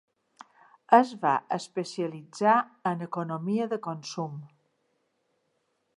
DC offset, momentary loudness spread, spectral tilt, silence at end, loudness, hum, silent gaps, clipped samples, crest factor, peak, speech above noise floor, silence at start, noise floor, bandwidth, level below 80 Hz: under 0.1%; 14 LU; -6 dB/octave; 1.5 s; -28 LUFS; none; none; under 0.1%; 24 dB; -4 dBFS; 48 dB; 0.9 s; -75 dBFS; 11.5 kHz; -84 dBFS